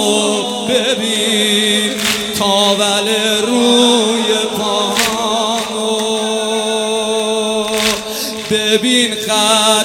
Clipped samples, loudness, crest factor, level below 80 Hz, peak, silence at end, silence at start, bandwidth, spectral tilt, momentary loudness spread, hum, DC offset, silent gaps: under 0.1%; -13 LUFS; 14 dB; -50 dBFS; 0 dBFS; 0 s; 0 s; 17.5 kHz; -2 dB/octave; 5 LU; none; under 0.1%; none